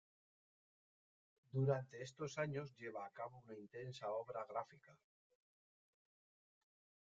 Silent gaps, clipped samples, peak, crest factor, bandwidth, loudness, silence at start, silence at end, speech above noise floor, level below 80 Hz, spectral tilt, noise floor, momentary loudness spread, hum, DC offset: none; under 0.1%; -26 dBFS; 24 dB; 7.4 kHz; -46 LUFS; 1.55 s; 2.05 s; over 44 dB; -84 dBFS; -6.5 dB/octave; under -90 dBFS; 13 LU; none; under 0.1%